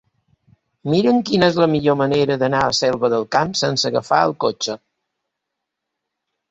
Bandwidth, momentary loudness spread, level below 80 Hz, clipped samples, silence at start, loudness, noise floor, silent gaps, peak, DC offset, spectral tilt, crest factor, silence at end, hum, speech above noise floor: 8.2 kHz; 6 LU; -54 dBFS; under 0.1%; 0.85 s; -18 LUFS; -80 dBFS; none; -2 dBFS; under 0.1%; -5 dB/octave; 18 dB; 1.75 s; none; 63 dB